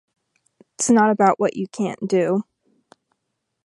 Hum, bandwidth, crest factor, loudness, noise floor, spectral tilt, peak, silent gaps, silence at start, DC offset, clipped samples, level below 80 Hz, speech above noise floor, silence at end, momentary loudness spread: none; 11.5 kHz; 20 dB; -20 LUFS; -77 dBFS; -5 dB/octave; -2 dBFS; none; 0.8 s; under 0.1%; under 0.1%; -68 dBFS; 58 dB; 1.25 s; 10 LU